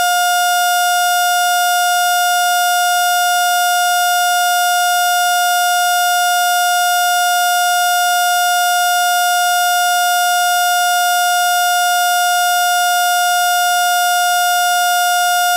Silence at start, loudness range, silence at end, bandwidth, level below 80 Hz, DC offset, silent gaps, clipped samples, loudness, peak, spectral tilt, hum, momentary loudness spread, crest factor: 0 s; 0 LU; 0 s; 16 kHz; -70 dBFS; 0.2%; none; under 0.1%; -13 LUFS; -2 dBFS; 5.5 dB/octave; none; 0 LU; 10 dB